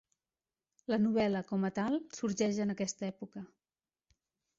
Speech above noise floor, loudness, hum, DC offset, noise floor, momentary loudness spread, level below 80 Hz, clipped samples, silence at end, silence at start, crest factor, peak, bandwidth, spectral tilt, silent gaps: over 56 dB; -34 LUFS; none; under 0.1%; under -90 dBFS; 17 LU; -72 dBFS; under 0.1%; 1.1 s; 0.9 s; 16 dB; -20 dBFS; 7.8 kHz; -5.5 dB/octave; none